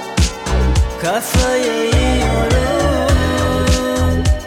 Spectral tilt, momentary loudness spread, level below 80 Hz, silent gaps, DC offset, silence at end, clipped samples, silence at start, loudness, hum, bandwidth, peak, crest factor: -5 dB/octave; 3 LU; -20 dBFS; none; under 0.1%; 0 s; under 0.1%; 0 s; -16 LUFS; none; 17 kHz; -2 dBFS; 12 dB